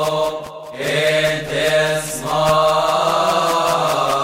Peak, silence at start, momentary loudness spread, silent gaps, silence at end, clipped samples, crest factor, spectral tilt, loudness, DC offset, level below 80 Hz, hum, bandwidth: -4 dBFS; 0 s; 7 LU; none; 0 s; under 0.1%; 14 dB; -3.5 dB/octave; -17 LUFS; under 0.1%; -46 dBFS; none; 16 kHz